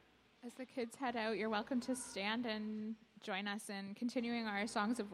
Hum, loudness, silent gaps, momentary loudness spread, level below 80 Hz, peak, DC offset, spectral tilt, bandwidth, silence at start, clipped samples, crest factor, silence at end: none; -41 LUFS; none; 10 LU; -78 dBFS; -24 dBFS; under 0.1%; -4 dB/octave; 14 kHz; 0.4 s; under 0.1%; 18 dB; 0 s